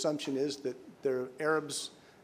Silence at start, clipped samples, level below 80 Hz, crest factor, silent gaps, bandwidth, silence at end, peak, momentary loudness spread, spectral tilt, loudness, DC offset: 0 s; under 0.1%; -82 dBFS; 16 dB; none; 15.5 kHz; 0.25 s; -18 dBFS; 8 LU; -3.5 dB/octave; -35 LUFS; under 0.1%